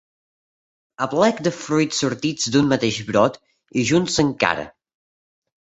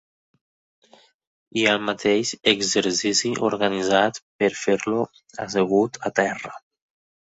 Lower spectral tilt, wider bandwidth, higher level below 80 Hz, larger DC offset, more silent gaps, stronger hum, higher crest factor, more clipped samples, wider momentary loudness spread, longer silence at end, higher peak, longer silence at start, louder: first, -4.5 dB/octave vs -3 dB/octave; about the same, 8.2 kHz vs 8.2 kHz; first, -54 dBFS vs -62 dBFS; neither; second, none vs 4.22-4.39 s; neither; about the same, 20 dB vs 22 dB; neither; about the same, 7 LU vs 7 LU; first, 1.1 s vs 0.65 s; about the same, -2 dBFS vs -2 dBFS; second, 1 s vs 1.55 s; about the same, -20 LUFS vs -22 LUFS